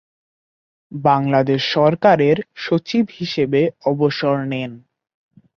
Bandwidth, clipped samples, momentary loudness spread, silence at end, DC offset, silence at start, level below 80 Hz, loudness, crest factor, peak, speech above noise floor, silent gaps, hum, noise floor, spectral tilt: 6.8 kHz; under 0.1%; 8 LU; 0.8 s; under 0.1%; 0.9 s; -60 dBFS; -18 LUFS; 18 dB; -2 dBFS; over 73 dB; none; none; under -90 dBFS; -7 dB/octave